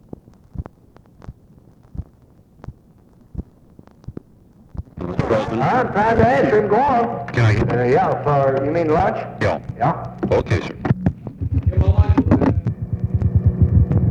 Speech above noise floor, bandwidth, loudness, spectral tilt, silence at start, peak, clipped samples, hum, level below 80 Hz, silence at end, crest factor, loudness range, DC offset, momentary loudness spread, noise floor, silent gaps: 33 dB; 7.6 kHz; -18 LUFS; -8.5 dB/octave; 0.55 s; 0 dBFS; under 0.1%; none; -30 dBFS; 0 s; 18 dB; 22 LU; under 0.1%; 20 LU; -50 dBFS; none